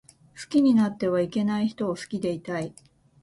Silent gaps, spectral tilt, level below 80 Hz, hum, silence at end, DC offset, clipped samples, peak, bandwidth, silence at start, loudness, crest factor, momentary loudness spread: none; -6.5 dB/octave; -64 dBFS; none; 0.5 s; under 0.1%; under 0.1%; -12 dBFS; 11.5 kHz; 0.35 s; -25 LUFS; 14 dB; 12 LU